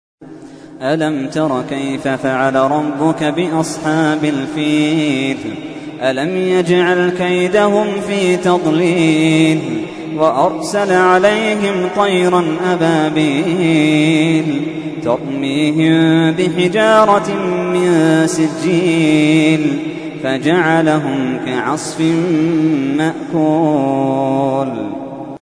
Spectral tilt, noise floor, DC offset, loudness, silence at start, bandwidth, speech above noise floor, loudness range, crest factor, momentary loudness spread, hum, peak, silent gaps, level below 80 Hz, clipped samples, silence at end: -6 dB/octave; -34 dBFS; under 0.1%; -14 LUFS; 0.2 s; 11 kHz; 21 dB; 3 LU; 14 dB; 8 LU; none; 0 dBFS; none; -54 dBFS; under 0.1%; 0.05 s